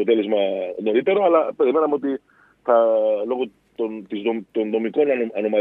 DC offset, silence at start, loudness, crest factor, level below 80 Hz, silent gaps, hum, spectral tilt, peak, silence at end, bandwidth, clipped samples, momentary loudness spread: under 0.1%; 0 s; -21 LUFS; 16 dB; -70 dBFS; none; none; -8.5 dB/octave; -4 dBFS; 0 s; 4 kHz; under 0.1%; 11 LU